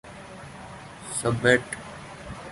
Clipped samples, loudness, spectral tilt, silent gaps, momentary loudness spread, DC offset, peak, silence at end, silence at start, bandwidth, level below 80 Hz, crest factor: under 0.1%; -25 LUFS; -4 dB/octave; none; 21 LU; under 0.1%; -4 dBFS; 0 s; 0.05 s; 11.5 kHz; -52 dBFS; 24 dB